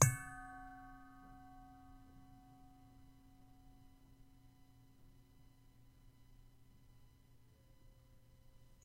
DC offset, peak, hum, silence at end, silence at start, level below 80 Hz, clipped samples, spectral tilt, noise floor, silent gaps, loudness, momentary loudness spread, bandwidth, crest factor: under 0.1%; -12 dBFS; none; 0.1 s; 0 s; -64 dBFS; under 0.1%; -4 dB/octave; -66 dBFS; none; -45 LUFS; 15 LU; 16 kHz; 36 dB